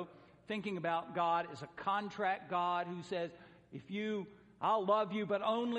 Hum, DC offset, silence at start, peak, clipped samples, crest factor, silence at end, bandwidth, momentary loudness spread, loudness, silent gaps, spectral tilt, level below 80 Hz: none; under 0.1%; 0 s; -20 dBFS; under 0.1%; 18 dB; 0 s; 10.5 kHz; 12 LU; -37 LUFS; none; -6 dB/octave; -78 dBFS